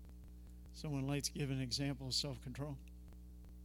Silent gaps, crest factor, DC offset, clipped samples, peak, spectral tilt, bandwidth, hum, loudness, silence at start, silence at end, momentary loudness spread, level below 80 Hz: none; 20 dB; under 0.1%; under 0.1%; -24 dBFS; -4.5 dB/octave; 16.5 kHz; 60 Hz at -55 dBFS; -41 LUFS; 0 s; 0 s; 19 LU; -56 dBFS